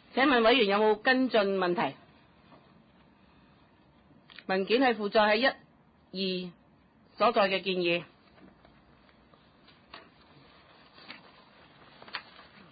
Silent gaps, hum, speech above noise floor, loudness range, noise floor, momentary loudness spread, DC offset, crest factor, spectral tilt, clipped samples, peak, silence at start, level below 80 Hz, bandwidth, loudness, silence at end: none; none; 35 dB; 10 LU; -62 dBFS; 22 LU; under 0.1%; 18 dB; -8.5 dB/octave; under 0.1%; -12 dBFS; 0.15 s; -68 dBFS; 5 kHz; -27 LUFS; 0.5 s